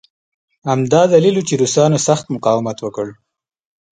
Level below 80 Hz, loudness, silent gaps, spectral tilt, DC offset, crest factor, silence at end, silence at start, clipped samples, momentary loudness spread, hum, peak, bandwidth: -58 dBFS; -15 LUFS; none; -5.5 dB/octave; under 0.1%; 16 dB; 0.8 s; 0.65 s; under 0.1%; 13 LU; none; 0 dBFS; 9.6 kHz